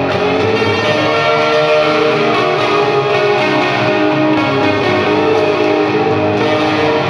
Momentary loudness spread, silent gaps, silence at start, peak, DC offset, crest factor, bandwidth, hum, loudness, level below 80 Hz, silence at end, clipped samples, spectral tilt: 2 LU; none; 0 s; 0 dBFS; under 0.1%; 12 dB; 11 kHz; none; -12 LUFS; -50 dBFS; 0 s; under 0.1%; -5.5 dB/octave